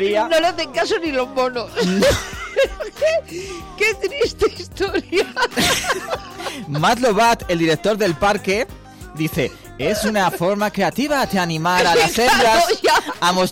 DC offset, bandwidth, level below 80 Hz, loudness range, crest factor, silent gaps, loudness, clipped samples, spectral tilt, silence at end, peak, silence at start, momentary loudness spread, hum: under 0.1%; 16.5 kHz; -42 dBFS; 4 LU; 12 dB; none; -18 LUFS; under 0.1%; -3.5 dB/octave; 0 s; -8 dBFS; 0 s; 10 LU; none